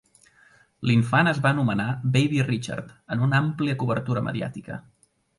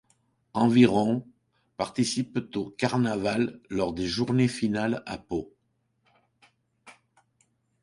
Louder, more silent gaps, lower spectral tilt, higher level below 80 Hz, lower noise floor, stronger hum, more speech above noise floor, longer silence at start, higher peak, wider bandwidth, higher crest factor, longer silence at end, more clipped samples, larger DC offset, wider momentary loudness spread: first, -24 LUFS vs -27 LUFS; neither; about the same, -7 dB/octave vs -6 dB/octave; about the same, -58 dBFS vs -58 dBFS; second, -58 dBFS vs -74 dBFS; neither; second, 34 dB vs 48 dB; first, 0.8 s vs 0.55 s; about the same, -6 dBFS vs -6 dBFS; about the same, 11.5 kHz vs 11.5 kHz; about the same, 20 dB vs 22 dB; second, 0.6 s vs 0.9 s; neither; neither; about the same, 13 LU vs 14 LU